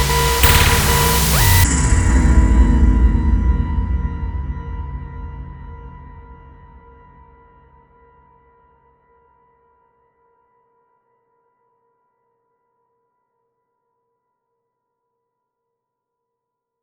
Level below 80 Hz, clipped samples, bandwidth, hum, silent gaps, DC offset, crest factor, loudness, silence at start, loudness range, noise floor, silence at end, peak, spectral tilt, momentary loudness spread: -22 dBFS; under 0.1%; over 20 kHz; none; none; under 0.1%; 20 dB; -15 LUFS; 0 s; 23 LU; -80 dBFS; 10.5 s; 0 dBFS; -4 dB/octave; 22 LU